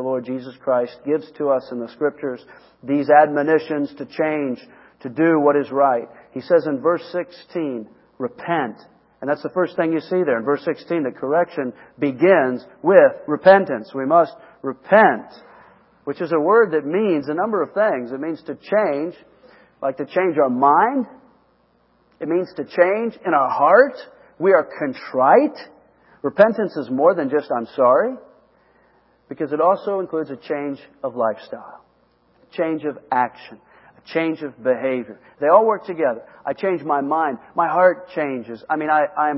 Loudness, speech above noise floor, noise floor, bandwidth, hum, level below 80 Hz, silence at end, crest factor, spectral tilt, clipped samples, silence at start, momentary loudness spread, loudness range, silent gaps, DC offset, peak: -19 LUFS; 41 dB; -60 dBFS; 5.8 kHz; none; -70 dBFS; 0 s; 20 dB; -10 dB/octave; under 0.1%; 0 s; 15 LU; 7 LU; none; under 0.1%; 0 dBFS